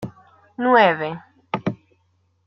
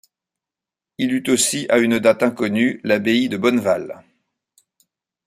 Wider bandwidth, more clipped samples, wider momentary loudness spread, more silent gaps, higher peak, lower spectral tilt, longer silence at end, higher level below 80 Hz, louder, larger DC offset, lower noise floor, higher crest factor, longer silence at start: second, 6.4 kHz vs 15.5 kHz; neither; first, 23 LU vs 7 LU; neither; about the same, -2 dBFS vs -2 dBFS; first, -7.5 dB/octave vs -3.5 dB/octave; second, 0.7 s vs 1.3 s; about the same, -62 dBFS vs -62 dBFS; about the same, -20 LUFS vs -18 LUFS; neither; second, -65 dBFS vs -88 dBFS; about the same, 20 dB vs 18 dB; second, 0 s vs 1 s